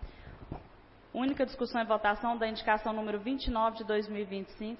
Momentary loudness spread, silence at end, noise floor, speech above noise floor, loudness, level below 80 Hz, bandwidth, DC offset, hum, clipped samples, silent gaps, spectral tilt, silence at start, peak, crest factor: 17 LU; 0 s; -56 dBFS; 24 dB; -33 LUFS; -50 dBFS; 5.8 kHz; under 0.1%; none; under 0.1%; none; -3 dB/octave; 0 s; -14 dBFS; 20 dB